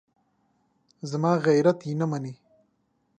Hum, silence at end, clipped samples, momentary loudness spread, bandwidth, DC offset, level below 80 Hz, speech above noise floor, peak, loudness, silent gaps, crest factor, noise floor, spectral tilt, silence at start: none; 0.85 s; under 0.1%; 16 LU; 9.2 kHz; under 0.1%; -76 dBFS; 47 dB; -8 dBFS; -25 LUFS; none; 20 dB; -71 dBFS; -7.5 dB/octave; 1.05 s